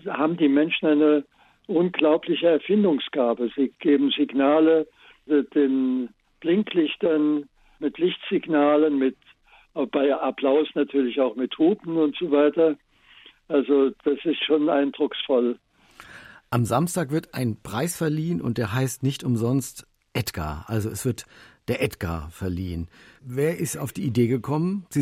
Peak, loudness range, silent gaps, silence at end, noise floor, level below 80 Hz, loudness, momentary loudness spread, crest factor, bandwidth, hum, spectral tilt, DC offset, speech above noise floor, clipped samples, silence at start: -6 dBFS; 6 LU; none; 0 s; -56 dBFS; -54 dBFS; -23 LUFS; 11 LU; 18 dB; 16 kHz; none; -6 dB/octave; under 0.1%; 33 dB; under 0.1%; 0.05 s